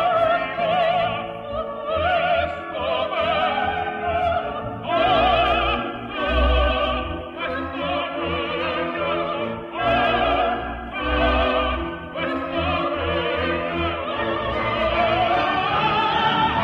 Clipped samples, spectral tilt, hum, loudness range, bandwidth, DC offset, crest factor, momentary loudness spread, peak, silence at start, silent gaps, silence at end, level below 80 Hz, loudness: under 0.1%; -7 dB/octave; none; 2 LU; 6.4 kHz; under 0.1%; 16 dB; 8 LU; -6 dBFS; 0 s; none; 0 s; -34 dBFS; -22 LUFS